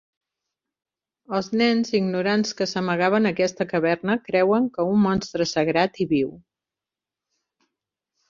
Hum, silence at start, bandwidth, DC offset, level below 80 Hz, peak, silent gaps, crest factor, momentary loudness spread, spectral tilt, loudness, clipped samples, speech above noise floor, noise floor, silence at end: none; 1.3 s; 7.4 kHz; under 0.1%; -60 dBFS; -6 dBFS; none; 18 dB; 5 LU; -5.5 dB/octave; -22 LUFS; under 0.1%; 67 dB; -89 dBFS; 1.9 s